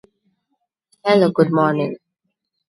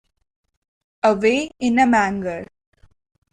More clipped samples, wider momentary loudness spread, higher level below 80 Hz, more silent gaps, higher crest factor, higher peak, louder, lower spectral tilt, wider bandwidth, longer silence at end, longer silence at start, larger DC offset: neither; about the same, 11 LU vs 12 LU; second, -66 dBFS vs -54 dBFS; neither; about the same, 20 dB vs 18 dB; about the same, -2 dBFS vs -4 dBFS; about the same, -17 LUFS vs -19 LUFS; first, -7.5 dB/octave vs -5 dB/octave; first, 11.5 kHz vs 9.8 kHz; second, 0.75 s vs 0.9 s; about the same, 1.05 s vs 1.05 s; neither